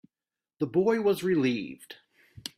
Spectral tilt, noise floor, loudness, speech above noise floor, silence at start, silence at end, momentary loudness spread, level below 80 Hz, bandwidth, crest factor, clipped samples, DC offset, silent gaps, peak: -6 dB/octave; under -90 dBFS; -27 LUFS; over 63 dB; 0.6 s; 0.1 s; 19 LU; -68 dBFS; 15.5 kHz; 16 dB; under 0.1%; under 0.1%; none; -14 dBFS